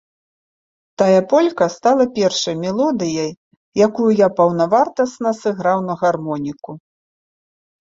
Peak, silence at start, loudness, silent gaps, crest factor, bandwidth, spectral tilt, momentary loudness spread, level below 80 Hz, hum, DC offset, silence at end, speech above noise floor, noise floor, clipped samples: -2 dBFS; 1 s; -17 LUFS; 3.37-3.51 s, 3.57-3.72 s; 16 dB; 7.8 kHz; -5.5 dB/octave; 10 LU; -60 dBFS; none; under 0.1%; 1.05 s; over 74 dB; under -90 dBFS; under 0.1%